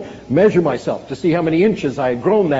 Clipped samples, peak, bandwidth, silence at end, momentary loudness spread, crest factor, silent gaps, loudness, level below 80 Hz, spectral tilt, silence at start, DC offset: under 0.1%; -2 dBFS; 8 kHz; 0 s; 7 LU; 14 dB; none; -17 LUFS; -50 dBFS; -6.5 dB/octave; 0 s; under 0.1%